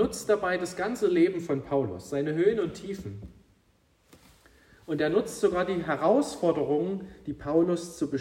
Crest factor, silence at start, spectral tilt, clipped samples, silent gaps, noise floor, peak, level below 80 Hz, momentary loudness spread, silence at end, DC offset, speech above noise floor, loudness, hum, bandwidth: 18 dB; 0 s; -6 dB/octave; under 0.1%; none; -66 dBFS; -10 dBFS; -58 dBFS; 13 LU; 0 s; under 0.1%; 39 dB; -28 LUFS; none; 16 kHz